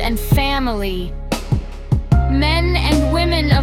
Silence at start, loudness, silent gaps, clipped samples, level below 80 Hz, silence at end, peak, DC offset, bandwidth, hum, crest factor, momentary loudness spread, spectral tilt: 0 s; -18 LUFS; none; under 0.1%; -20 dBFS; 0 s; -2 dBFS; under 0.1%; 17 kHz; none; 14 dB; 8 LU; -6 dB/octave